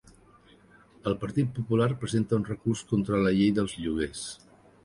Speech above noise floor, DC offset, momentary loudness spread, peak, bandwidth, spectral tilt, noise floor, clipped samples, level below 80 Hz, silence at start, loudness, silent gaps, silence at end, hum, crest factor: 30 dB; under 0.1%; 10 LU; -12 dBFS; 11.5 kHz; -6.5 dB/octave; -57 dBFS; under 0.1%; -52 dBFS; 1.05 s; -28 LUFS; none; 0.5 s; none; 16 dB